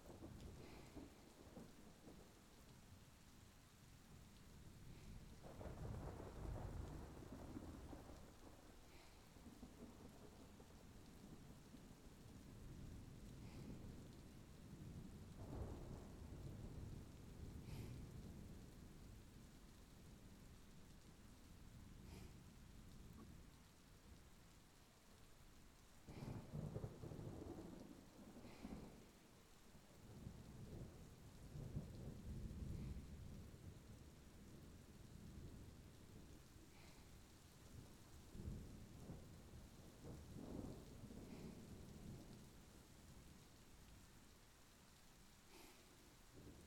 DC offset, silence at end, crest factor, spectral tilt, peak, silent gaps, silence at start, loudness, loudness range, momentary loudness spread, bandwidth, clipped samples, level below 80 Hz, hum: under 0.1%; 0 s; 20 dB; -6 dB/octave; -38 dBFS; none; 0 s; -60 LUFS; 8 LU; 12 LU; 18 kHz; under 0.1%; -64 dBFS; none